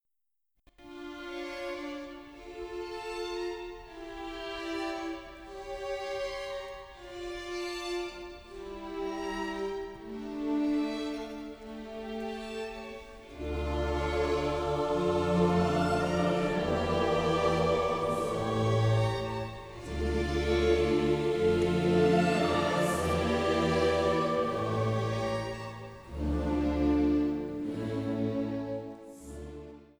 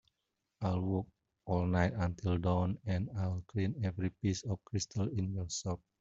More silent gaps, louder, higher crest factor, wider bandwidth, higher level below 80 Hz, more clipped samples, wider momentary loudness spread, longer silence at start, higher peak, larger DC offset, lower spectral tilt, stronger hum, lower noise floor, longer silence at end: neither; first, -31 LUFS vs -36 LUFS; about the same, 16 dB vs 20 dB; first, over 20 kHz vs 7.8 kHz; first, -44 dBFS vs -58 dBFS; neither; first, 17 LU vs 6 LU; first, 0.8 s vs 0.6 s; about the same, -14 dBFS vs -16 dBFS; neither; about the same, -6.5 dB/octave vs -6 dB/octave; neither; about the same, -87 dBFS vs -86 dBFS; about the same, 0.15 s vs 0.25 s